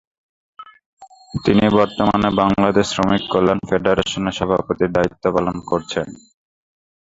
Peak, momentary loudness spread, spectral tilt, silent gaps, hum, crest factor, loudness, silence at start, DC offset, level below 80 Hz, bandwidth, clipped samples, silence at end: 0 dBFS; 7 LU; -6 dB/octave; 0.86-0.97 s; none; 18 dB; -18 LUFS; 0.6 s; under 0.1%; -44 dBFS; 7.8 kHz; under 0.1%; 0.85 s